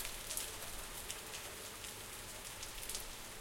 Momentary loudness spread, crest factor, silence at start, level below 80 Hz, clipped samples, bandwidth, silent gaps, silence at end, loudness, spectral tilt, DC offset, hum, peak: 5 LU; 28 dB; 0 s; -58 dBFS; under 0.1%; 17 kHz; none; 0 s; -44 LUFS; -1 dB/octave; under 0.1%; none; -18 dBFS